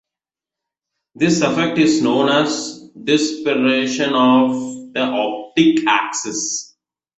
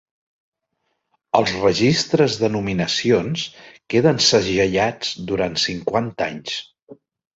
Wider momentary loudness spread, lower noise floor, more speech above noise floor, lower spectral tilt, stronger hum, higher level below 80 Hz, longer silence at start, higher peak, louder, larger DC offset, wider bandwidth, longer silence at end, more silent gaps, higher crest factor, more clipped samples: about the same, 10 LU vs 11 LU; first, -88 dBFS vs -73 dBFS; first, 71 dB vs 54 dB; about the same, -4 dB/octave vs -4.5 dB/octave; neither; second, -60 dBFS vs -50 dBFS; second, 1.2 s vs 1.35 s; about the same, -2 dBFS vs -2 dBFS; about the same, -17 LUFS vs -19 LUFS; neither; about the same, 8.2 kHz vs 8 kHz; about the same, 0.55 s vs 0.45 s; second, none vs 6.83-6.87 s; about the same, 16 dB vs 18 dB; neither